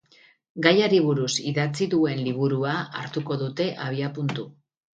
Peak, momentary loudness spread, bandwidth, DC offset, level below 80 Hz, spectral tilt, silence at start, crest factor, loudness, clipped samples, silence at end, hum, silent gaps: -2 dBFS; 11 LU; 9.4 kHz; under 0.1%; -68 dBFS; -5.5 dB/octave; 0.55 s; 24 dB; -24 LUFS; under 0.1%; 0.5 s; none; none